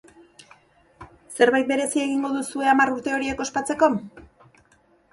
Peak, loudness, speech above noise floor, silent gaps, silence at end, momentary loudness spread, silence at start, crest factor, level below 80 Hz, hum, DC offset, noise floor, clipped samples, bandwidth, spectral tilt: -4 dBFS; -22 LUFS; 38 dB; none; 0.85 s; 8 LU; 1 s; 20 dB; -58 dBFS; none; under 0.1%; -60 dBFS; under 0.1%; 11.5 kHz; -3.5 dB/octave